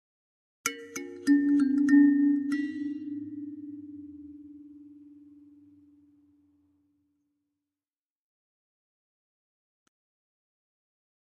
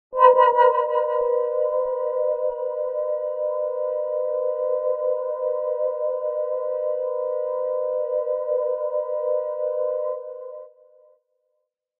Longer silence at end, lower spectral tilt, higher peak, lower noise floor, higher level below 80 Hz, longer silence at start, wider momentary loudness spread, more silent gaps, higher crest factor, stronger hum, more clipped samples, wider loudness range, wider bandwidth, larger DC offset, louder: first, 6.5 s vs 1.3 s; about the same, -3.5 dB/octave vs -4.5 dB/octave; second, -12 dBFS vs -2 dBFS; first, under -90 dBFS vs -76 dBFS; second, -80 dBFS vs -70 dBFS; first, 0.65 s vs 0.1 s; first, 25 LU vs 8 LU; neither; about the same, 20 dB vs 22 dB; neither; neither; first, 21 LU vs 4 LU; first, 12 kHz vs 3.2 kHz; neither; second, -26 LUFS vs -23 LUFS